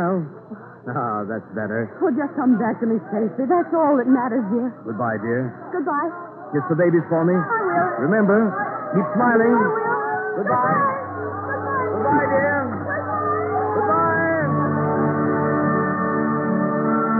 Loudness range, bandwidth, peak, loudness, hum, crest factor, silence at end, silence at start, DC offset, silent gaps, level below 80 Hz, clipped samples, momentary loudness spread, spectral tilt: 3 LU; 2.8 kHz; -6 dBFS; -21 LUFS; none; 14 dB; 0 s; 0 s; under 0.1%; none; -68 dBFS; under 0.1%; 9 LU; -13 dB/octave